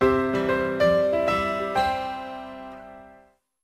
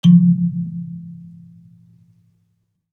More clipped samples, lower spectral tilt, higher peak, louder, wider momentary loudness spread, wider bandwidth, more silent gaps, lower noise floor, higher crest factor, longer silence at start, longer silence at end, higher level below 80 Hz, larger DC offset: neither; second, -6 dB/octave vs -9 dB/octave; second, -8 dBFS vs -2 dBFS; second, -23 LUFS vs -17 LUFS; second, 19 LU vs 27 LU; first, 15 kHz vs 6.4 kHz; neither; second, -56 dBFS vs -67 dBFS; about the same, 16 dB vs 16 dB; about the same, 0 s vs 0.05 s; second, 0.55 s vs 1.8 s; first, -48 dBFS vs -72 dBFS; neither